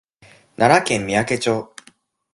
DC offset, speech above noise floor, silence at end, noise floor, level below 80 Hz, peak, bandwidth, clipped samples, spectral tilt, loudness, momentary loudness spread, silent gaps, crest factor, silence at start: under 0.1%; 37 dB; 0.7 s; -54 dBFS; -54 dBFS; 0 dBFS; 11.5 kHz; under 0.1%; -4.5 dB/octave; -18 LUFS; 9 LU; none; 20 dB; 0.6 s